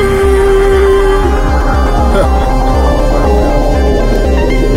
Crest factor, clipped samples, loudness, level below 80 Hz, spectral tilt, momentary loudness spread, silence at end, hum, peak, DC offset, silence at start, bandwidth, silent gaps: 8 dB; under 0.1%; -10 LUFS; -12 dBFS; -6.5 dB/octave; 3 LU; 0 s; none; 0 dBFS; under 0.1%; 0 s; 15 kHz; none